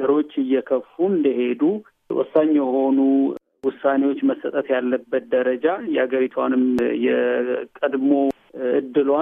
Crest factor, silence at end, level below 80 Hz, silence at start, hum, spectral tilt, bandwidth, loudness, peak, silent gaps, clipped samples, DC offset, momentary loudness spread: 16 dB; 0 s; -66 dBFS; 0 s; none; -8 dB/octave; 3.8 kHz; -21 LUFS; -4 dBFS; none; under 0.1%; under 0.1%; 7 LU